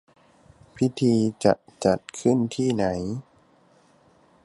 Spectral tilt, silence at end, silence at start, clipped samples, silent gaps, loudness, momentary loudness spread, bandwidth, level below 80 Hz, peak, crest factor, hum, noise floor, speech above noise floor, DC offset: -6.5 dB/octave; 1.25 s; 0.75 s; under 0.1%; none; -24 LUFS; 7 LU; 11.5 kHz; -54 dBFS; -4 dBFS; 20 dB; none; -59 dBFS; 36 dB; under 0.1%